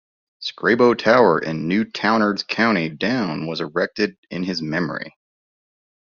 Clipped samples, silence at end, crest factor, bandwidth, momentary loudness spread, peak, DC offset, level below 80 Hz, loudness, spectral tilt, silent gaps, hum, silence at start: under 0.1%; 1 s; 18 dB; 7.2 kHz; 12 LU; -2 dBFS; under 0.1%; -60 dBFS; -20 LUFS; -3.5 dB/octave; 4.18-4.23 s; none; 0.4 s